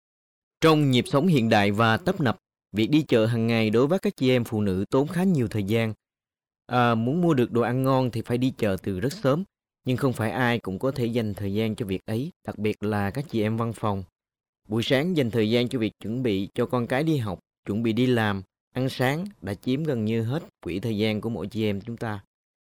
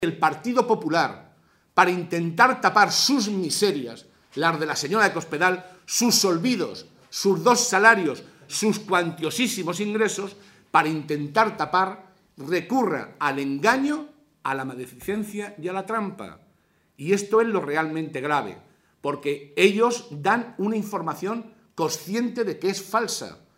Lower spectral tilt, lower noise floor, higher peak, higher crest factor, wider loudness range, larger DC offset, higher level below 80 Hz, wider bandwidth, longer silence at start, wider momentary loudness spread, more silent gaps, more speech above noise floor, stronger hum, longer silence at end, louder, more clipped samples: first, -7 dB/octave vs -3.5 dB/octave; first, under -90 dBFS vs -64 dBFS; second, -10 dBFS vs 0 dBFS; second, 16 dB vs 24 dB; about the same, 5 LU vs 6 LU; neither; first, -58 dBFS vs -70 dBFS; about the same, 16.5 kHz vs 16 kHz; first, 0.6 s vs 0 s; second, 10 LU vs 13 LU; first, 12.36-12.41 s, 14.49-14.53 s, 17.58-17.63 s, 18.60-18.71 s vs none; first, over 66 dB vs 41 dB; neither; first, 0.5 s vs 0.25 s; about the same, -25 LUFS vs -23 LUFS; neither